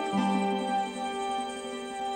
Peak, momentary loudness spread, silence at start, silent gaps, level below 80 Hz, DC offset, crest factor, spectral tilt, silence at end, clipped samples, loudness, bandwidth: -16 dBFS; 8 LU; 0 s; none; -68 dBFS; under 0.1%; 16 dB; -5 dB/octave; 0 s; under 0.1%; -31 LUFS; 16 kHz